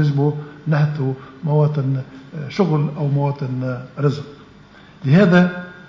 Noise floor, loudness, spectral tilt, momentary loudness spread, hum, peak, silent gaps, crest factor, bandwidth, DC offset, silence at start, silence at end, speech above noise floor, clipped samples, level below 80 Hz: -44 dBFS; -19 LUFS; -9 dB/octave; 14 LU; none; -2 dBFS; none; 16 dB; 7.2 kHz; under 0.1%; 0 s; 0.05 s; 27 dB; under 0.1%; -56 dBFS